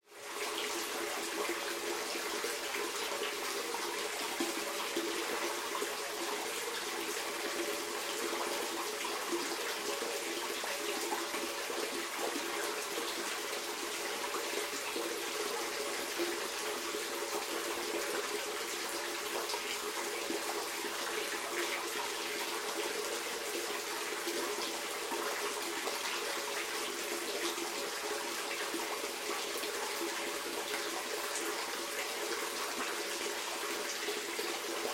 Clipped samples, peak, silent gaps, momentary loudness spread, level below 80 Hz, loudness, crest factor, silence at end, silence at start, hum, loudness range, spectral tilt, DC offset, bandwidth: under 0.1%; -22 dBFS; none; 1 LU; -74 dBFS; -36 LUFS; 16 dB; 0 s; 0.1 s; none; 0 LU; 0 dB/octave; under 0.1%; 16.5 kHz